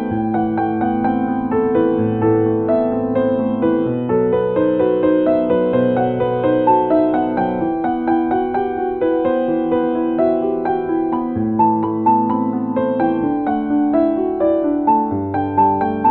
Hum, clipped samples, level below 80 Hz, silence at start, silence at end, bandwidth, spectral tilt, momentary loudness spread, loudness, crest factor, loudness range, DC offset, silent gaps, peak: none; under 0.1%; -46 dBFS; 0 s; 0 s; 4.3 kHz; -12 dB/octave; 4 LU; -17 LUFS; 14 dB; 2 LU; under 0.1%; none; -4 dBFS